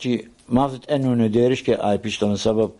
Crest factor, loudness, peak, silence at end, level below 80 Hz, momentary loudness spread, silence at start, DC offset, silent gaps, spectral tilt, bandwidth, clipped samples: 16 dB; -21 LUFS; -4 dBFS; 0.05 s; -48 dBFS; 5 LU; 0 s; under 0.1%; none; -6.5 dB/octave; 11.5 kHz; under 0.1%